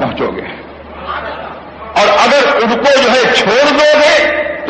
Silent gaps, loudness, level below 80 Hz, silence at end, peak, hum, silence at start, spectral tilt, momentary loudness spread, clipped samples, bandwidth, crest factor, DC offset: none; -9 LUFS; -42 dBFS; 0 s; 0 dBFS; none; 0 s; -3 dB/octave; 19 LU; under 0.1%; 9.4 kHz; 12 dB; under 0.1%